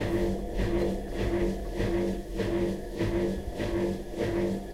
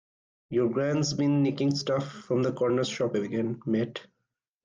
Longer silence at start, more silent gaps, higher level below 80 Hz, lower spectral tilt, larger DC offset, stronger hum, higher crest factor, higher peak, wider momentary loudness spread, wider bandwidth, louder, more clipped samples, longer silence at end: second, 0 s vs 0.5 s; neither; first, -36 dBFS vs -66 dBFS; about the same, -7 dB/octave vs -6 dB/octave; neither; neither; about the same, 14 dB vs 14 dB; about the same, -16 dBFS vs -16 dBFS; second, 3 LU vs 6 LU; first, 16 kHz vs 9.6 kHz; second, -31 LUFS vs -28 LUFS; neither; second, 0 s vs 0.6 s